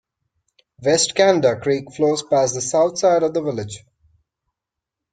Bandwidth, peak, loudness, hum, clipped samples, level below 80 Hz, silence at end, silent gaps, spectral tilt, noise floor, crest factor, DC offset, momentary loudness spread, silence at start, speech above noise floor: 9.6 kHz; -2 dBFS; -18 LUFS; none; under 0.1%; -60 dBFS; 1.35 s; none; -3.5 dB/octave; -84 dBFS; 18 dB; under 0.1%; 11 LU; 0.8 s; 66 dB